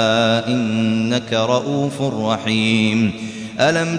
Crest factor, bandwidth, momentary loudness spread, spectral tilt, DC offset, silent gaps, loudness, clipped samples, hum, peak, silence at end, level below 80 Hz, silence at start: 16 dB; 10.5 kHz; 5 LU; -5.5 dB/octave; under 0.1%; none; -18 LUFS; under 0.1%; none; -2 dBFS; 0 s; -56 dBFS; 0 s